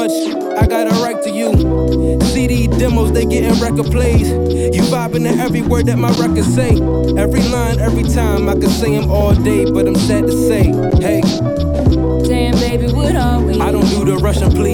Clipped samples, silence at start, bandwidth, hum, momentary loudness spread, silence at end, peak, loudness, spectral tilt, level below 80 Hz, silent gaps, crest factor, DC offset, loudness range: under 0.1%; 0 s; 17.5 kHz; none; 2 LU; 0 s; 0 dBFS; -14 LUFS; -6.5 dB/octave; -20 dBFS; none; 12 dB; under 0.1%; 1 LU